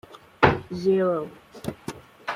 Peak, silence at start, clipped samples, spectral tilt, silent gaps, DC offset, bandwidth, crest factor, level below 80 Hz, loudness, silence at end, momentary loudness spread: -2 dBFS; 0.1 s; under 0.1%; -6.5 dB/octave; none; under 0.1%; 15 kHz; 24 dB; -50 dBFS; -24 LUFS; 0 s; 18 LU